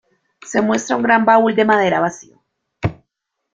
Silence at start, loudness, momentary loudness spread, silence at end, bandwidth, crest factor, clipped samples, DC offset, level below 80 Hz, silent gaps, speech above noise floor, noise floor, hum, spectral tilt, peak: 0.45 s; -16 LUFS; 13 LU; 0.6 s; 7.8 kHz; 16 dB; under 0.1%; under 0.1%; -50 dBFS; none; 61 dB; -76 dBFS; none; -5 dB/octave; -2 dBFS